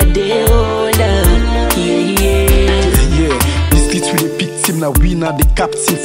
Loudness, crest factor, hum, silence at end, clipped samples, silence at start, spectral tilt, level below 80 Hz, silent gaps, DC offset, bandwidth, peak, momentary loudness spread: -13 LUFS; 12 dB; none; 0 s; under 0.1%; 0 s; -4.5 dB/octave; -14 dBFS; none; under 0.1%; 16.5 kHz; 0 dBFS; 3 LU